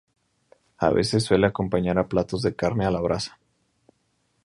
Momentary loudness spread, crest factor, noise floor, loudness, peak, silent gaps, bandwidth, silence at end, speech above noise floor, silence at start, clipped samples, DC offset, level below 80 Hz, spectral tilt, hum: 6 LU; 22 dB; -70 dBFS; -24 LUFS; -4 dBFS; none; 11.5 kHz; 1.15 s; 47 dB; 0.8 s; under 0.1%; under 0.1%; -46 dBFS; -6 dB/octave; none